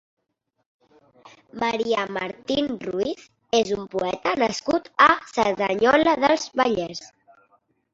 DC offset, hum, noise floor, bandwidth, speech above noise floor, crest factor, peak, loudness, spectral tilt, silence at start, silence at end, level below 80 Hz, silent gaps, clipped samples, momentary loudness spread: under 0.1%; none; -76 dBFS; 8 kHz; 54 dB; 22 dB; -2 dBFS; -22 LUFS; -4 dB/octave; 1.25 s; 0.85 s; -58 dBFS; none; under 0.1%; 12 LU